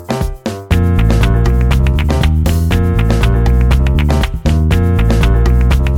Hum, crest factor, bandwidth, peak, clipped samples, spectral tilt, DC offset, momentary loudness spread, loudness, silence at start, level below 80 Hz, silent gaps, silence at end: none; 10 dB; 16 kHz; 0 dBFS; under 0.1%; -7 dB/octave; under 0.1%; 3 LU; -13 LUFS; 0 s; -14 dBFS; none; 0 s